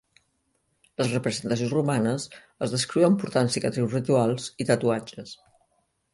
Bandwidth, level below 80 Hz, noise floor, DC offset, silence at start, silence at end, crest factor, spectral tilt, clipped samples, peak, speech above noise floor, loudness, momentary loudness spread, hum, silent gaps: 11.5 kHz; -64 dBFS; -72 dBFS; under 0.1%; 1 s; 0.8 s; 20 dB; -5.5 dB/octave; under 0.1%; -6 dBFS; 47 dB; -25 LUFS; 13 LU; none; none